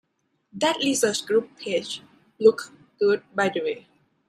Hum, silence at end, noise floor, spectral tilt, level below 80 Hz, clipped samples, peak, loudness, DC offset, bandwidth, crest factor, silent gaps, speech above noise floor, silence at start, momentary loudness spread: none; 0.5 s; -70 dBFS; -3 dB/octave; -72 dBFS; under 0.1%; -4 dBFS; -24 LUFS; under 0.1%; 14 kHz; 20 dB; none; 47 dB; 0.55 s; 15 LU